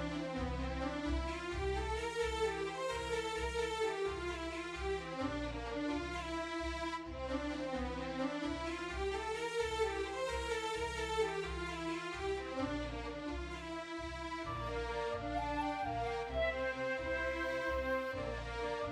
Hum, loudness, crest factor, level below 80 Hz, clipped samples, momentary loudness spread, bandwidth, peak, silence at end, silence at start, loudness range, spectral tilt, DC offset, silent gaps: none; -39 LUFS; 16 dB; -48 dBFS; under 0.1%; 5 LU; 13.5 kHz; -24 dBFS; 0 s; 0 s; 3 LU; -5 dB/octave; under 0.1%; none